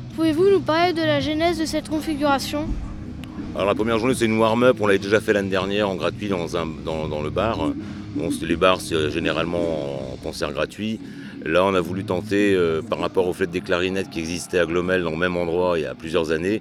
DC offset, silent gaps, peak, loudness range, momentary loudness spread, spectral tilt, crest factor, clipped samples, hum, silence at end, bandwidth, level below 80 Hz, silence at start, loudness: under 0.1%; none; -2 dBFS; 3 LU; 10 LU; -5.5 dB/octave; 20 dB; under 0.1%; none; 0 s; 15.5 kHz; -42 dBFS; 0 s; -22 LUFS